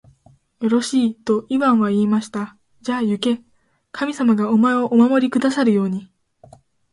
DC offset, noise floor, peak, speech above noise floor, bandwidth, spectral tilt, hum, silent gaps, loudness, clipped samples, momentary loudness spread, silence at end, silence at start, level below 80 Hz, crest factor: under 0.1%; -54 dBFS; -4 dBFS; 36 dB; 11.5 kHz; -6 dB/octave; none; none; -19 LUFS; under 0.1%; 12 LU; 0.9 s; 0.6 s; -64 dBFS; 14 dB